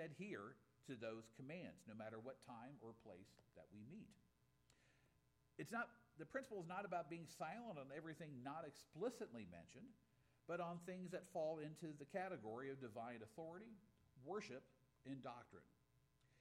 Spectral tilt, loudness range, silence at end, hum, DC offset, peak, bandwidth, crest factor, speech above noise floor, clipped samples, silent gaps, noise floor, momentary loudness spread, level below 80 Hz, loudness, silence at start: -6 dB/octave; 7 LU; 0 s; none; under 0.1%; -32 dBFS; 15.5 kHz; 22 dB; 27 dB; under 0.1%; none; -81 dBFS; 15 LU; -86 dBFS; -54 LUFS; 0 s